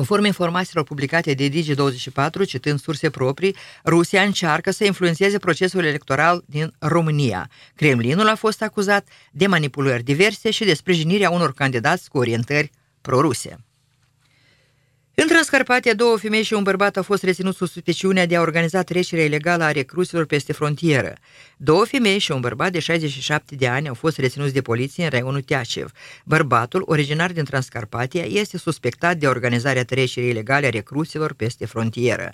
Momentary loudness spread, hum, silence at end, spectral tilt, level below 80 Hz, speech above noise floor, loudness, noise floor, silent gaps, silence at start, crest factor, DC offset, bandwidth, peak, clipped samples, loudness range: 7 LU; none; 0 s; -5 dB/octave; -58 dBFS; 43 dB; -20 LUFS; -62 dBFS; none; 0 s; 20 dB; under 0.1%; 15.5 kHz; 0 dBFS; under 0.1%; 3 LU